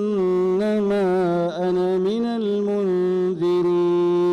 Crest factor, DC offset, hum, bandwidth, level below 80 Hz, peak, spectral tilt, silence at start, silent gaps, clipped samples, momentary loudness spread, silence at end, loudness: 4 dB; under 0.1%; none; 6.8 kHz; -60 dBFS; -16 dBFS; -8 dB/octave; 0 s; none; under 0.1%; 3 LU; 0 s; -21 LUFS